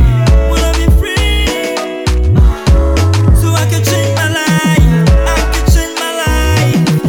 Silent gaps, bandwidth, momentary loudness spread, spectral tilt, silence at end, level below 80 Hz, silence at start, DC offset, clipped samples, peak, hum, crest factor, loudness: none; 18 kHz; 5 LU; -5.5 dB/octave; 0 s; -12 dBFS; 0 s; under 0.1%; under 0.1%; 0 dBFS; none; 10 dB; -11 LUFS